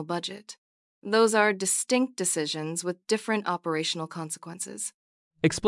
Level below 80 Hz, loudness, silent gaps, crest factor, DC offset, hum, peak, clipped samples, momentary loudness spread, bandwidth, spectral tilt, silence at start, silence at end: -68 dBFS; -27 LUFS; 0.58-1.02 s, 4.94-5.31 s; 20 dB; under 0.1%; none; -8 dBFS; under 0.1%; 13 LU; 12 kHz; -3 dB/octave; 0 s; 0 s